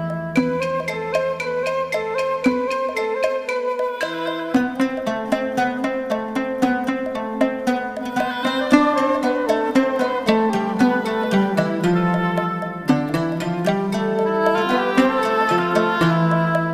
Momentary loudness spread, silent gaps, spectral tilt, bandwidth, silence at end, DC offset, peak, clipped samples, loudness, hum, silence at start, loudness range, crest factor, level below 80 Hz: 6 LU; none; -6.5 dB/octave; 15.5 kHz; 0 s; under 0.1%; 0 dBFS; under 0.1%; -20 LUFS; none; 0 s; 4 LU; 20 dB; -54 dBFS